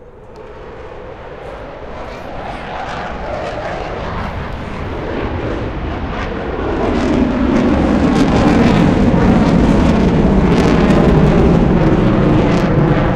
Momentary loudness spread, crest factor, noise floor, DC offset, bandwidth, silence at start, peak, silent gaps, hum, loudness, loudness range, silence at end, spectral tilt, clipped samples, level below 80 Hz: 18 LU; 12 dB; -34 dBFS; under 0.1%; 10 kHz; 0 s; -2 dBFS; none; none; -14 LUFS; 13 LU; 0 s; -8 dB/octave; under 0.1%; -22 dBFS